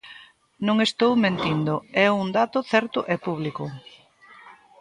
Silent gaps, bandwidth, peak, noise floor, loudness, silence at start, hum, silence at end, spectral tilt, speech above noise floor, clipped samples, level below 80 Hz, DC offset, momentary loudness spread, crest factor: none; 11 kHz; -6 dBFS; -50 dBFS; -23 LUFS; 0.05 s; none; 0.3 s; -6 dB/octave; 28 dB; under 0.1%; -62 dBFS; under 0.1%; 12 LU; 20 dB